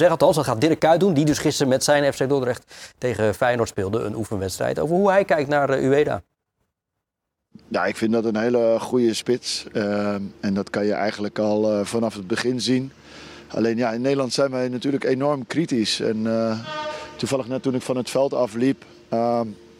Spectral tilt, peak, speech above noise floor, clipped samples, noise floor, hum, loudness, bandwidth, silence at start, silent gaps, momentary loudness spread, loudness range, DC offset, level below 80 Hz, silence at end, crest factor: -5 dB/octave; -4 dBFS; 61 dB; under 0.1%; -82 dBFS; none; -22 LUFS; 17.5 kHz; 0 s; none; 9 LU; 3 LU; under 0.1%; -58 dBFS; 0.25 s; 18 dB